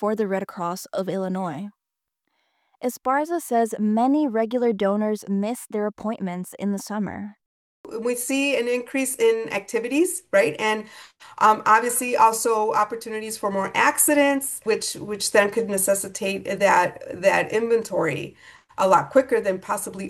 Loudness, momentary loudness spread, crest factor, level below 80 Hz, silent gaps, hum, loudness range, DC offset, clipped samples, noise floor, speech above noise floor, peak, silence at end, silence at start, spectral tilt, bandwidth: -22 LUFS; 11 LU; 18 dB; -66 dBFS; 7.46-7.84 s; none; 7 LU; under 0.1%; under 0.1%; -85 dBFS; 63 dB; -4 dBFS; 0 s; 0 s; -3.5 dB/octave; 16.5 kHz